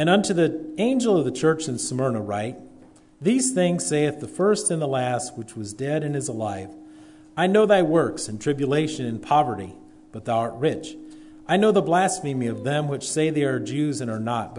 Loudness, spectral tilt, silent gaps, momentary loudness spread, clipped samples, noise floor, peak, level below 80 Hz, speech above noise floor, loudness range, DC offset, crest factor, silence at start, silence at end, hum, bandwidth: -23 LUFS; -5 dB/octave; none; 14 LU; under 0.1%; -50 dBFS; -6 dBFS; -62 dBFS; 27 dB; 3 LU; under 0.1%; 16 dB; 0 s; 0 s; none; 11 kHz